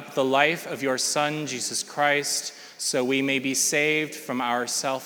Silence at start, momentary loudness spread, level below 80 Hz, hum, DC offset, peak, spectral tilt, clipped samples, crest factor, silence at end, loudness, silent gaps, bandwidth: 0 s; 7 LU; -86 dBFS; none; under 0.1%; -4 dBFS; -2 dB/octave; under 0.1%; 22 dB; 0 s; -24 LUFS; none; over 20 kHz